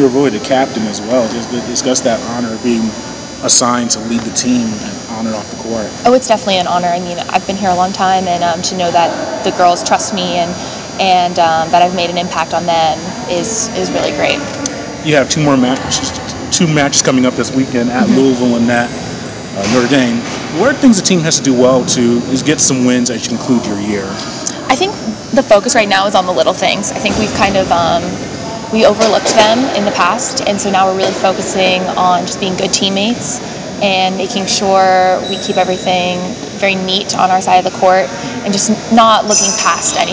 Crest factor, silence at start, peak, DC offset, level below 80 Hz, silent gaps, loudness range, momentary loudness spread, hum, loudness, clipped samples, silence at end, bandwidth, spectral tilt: 12 dB; 0 s; 0 dBFS; under 0.1%; -42 dBFS; none; 3 LU; 10 LU; none; -12 LUFS; 0.4%; 0 s; 8 kHz; -3.5 dB/octave